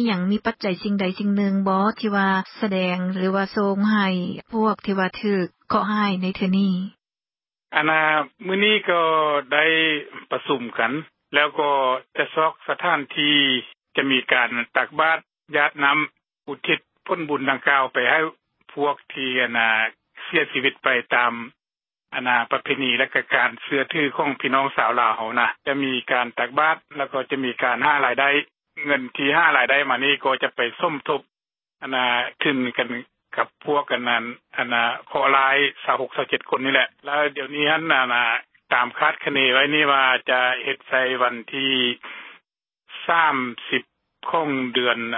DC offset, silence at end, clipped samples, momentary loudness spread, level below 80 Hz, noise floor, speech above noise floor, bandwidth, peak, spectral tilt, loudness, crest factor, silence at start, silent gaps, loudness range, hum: under 0.1%; 0 s; under 0.1%; 9 LU; -68 dBFS; under -90 dBFS; over 69 dB; 5.8 kHz; 0 dBFS; -9.5 dB/octave; -21 LUFS; 22 dB; 0 s; none; 4 LU; none